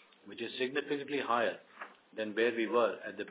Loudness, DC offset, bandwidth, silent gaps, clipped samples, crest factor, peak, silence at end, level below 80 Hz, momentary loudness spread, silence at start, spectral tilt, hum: -34 LUFS; under 0.1%; 4 kHz; none; under 0.1%; 18 dB; -16 dBFS; 0 s; -88 dBFS; 16 LU; 0.25 s; -2 dB/octave; none